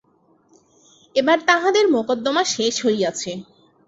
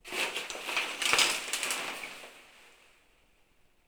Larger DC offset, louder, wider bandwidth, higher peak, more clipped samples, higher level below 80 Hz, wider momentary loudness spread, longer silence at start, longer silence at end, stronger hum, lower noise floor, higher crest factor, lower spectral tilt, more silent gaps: neither; first, -19 LUFS vs -30 LUFS; second, 8 kHz vs over 20 kHz; first, -2 dBFS vs -6 dBFS; neither; about the same, -66 dBFS vs -68 dBFS; second, 10 LU vs 18 LU; first, 1.15 s vs 0.05 s; second, 0.45 s vs 1.2 s; neither; second, -59 dBFS vs -66 dBFS; second, 20 dB vs 28 dB; first, -2.5 dB/octave vs 1 dB/octave; neither